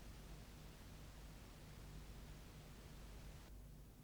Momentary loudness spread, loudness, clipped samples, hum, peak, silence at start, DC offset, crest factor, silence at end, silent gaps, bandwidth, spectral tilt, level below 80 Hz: 2 LU; -59 LUFS; under 0.1%; none; -44 dBFS; 0 s; under 0.1%; 14 dB; 0 s; none; over 20 kHz; -5 dB/octave; -60 dBFS